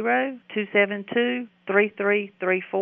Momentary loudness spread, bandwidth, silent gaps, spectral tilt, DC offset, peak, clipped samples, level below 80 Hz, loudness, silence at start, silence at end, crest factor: 6 LU; 3.7 kHz; none; -3 dB/octave; under 0.1%; -6 dBFS; under 0.1%; -82 dBFS; -24 LUFS; 0 s; 0 s; 18 dB